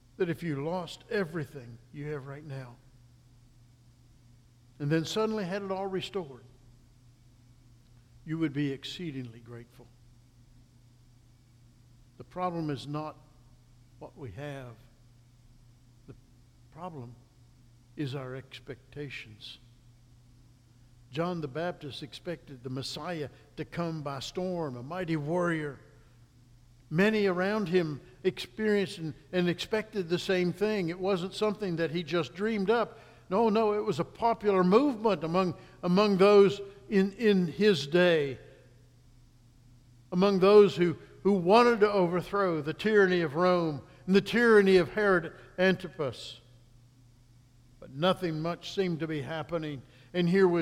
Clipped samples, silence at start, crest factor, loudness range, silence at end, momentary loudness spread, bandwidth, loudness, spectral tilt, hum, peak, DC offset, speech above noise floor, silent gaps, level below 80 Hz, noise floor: under 0.1%; 0.2 s; 22 dB; 18 LU; 0 s; 19 LU; 14 kHz; -29 LUFS; -6.5 dB/octave; none; -8 dBFS; under 0.1%; 31 dB; none; -62 dBFS; -59 dBFS